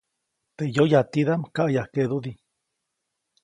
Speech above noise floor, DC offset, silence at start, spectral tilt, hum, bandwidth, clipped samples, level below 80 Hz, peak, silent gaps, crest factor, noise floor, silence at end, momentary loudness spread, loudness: 58 dB; under 0.1%; 0.6 s; -7.5 dB/octave; none; 10.5 kHz; under 0.1%; -64 dBFS; -4 dBFS; none; 20 dB; -80 dBFS; 1.1 s; 11 LU; -23 LUFS